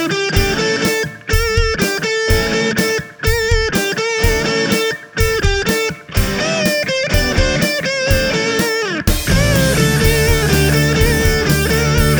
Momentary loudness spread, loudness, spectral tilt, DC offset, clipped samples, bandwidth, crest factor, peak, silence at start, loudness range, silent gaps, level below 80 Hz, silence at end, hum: 4 LU; -15 LUFS; -4 dB/octave; under 0.1%; under 0.1%; over 20 kHz; 14 dB; 0 dBFS; 0 s; 2 LU; none; -22 dBFS; 0 s; none